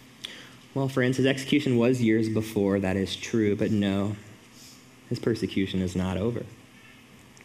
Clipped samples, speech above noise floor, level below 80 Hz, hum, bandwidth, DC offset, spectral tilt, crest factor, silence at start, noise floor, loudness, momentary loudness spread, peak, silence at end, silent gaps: under 0.1%; 26 dB; -60 dBFS; none; 15.5 kHz; under 0.1%; -6.5 dB/octave; 18 dB; 0.2 s; -51 dBFS; -26 LUFS; 14 LU; -8 dBFS; 0.55 s; none